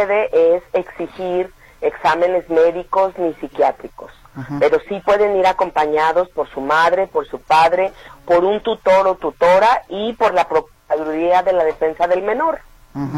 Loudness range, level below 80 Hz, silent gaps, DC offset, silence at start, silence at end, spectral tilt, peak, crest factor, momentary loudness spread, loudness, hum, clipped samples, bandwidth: 3 LU; -48 dBFS; none; under 0.1%; 0 s; 0 s; -5.5 dB/octave; -4 dBFS; 12 dB; 10 LU; -17 LUFS; none; under 0.1%; 13.5 kHz